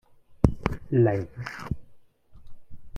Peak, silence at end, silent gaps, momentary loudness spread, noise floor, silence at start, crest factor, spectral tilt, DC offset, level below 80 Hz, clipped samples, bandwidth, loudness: 0 dBFS; 0 s; none; 14 LU; -51 dBFS; 0.3 s; 28 dB; -9 dB/octave; under 0.1%; -40 dBFS; under 0.1%; 9.6 kHz; -27 LUFS